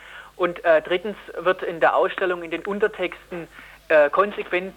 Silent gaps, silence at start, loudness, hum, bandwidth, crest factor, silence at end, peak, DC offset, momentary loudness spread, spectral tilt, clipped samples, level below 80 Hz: none; 0.05 s; -22 LUFS; none; 15.5 kHz; 18 dB; 0.05 s; -6 dBFS; under 0.1%; 16 LU; -5.5 dB/octave; under 0.1%; -58 dBFS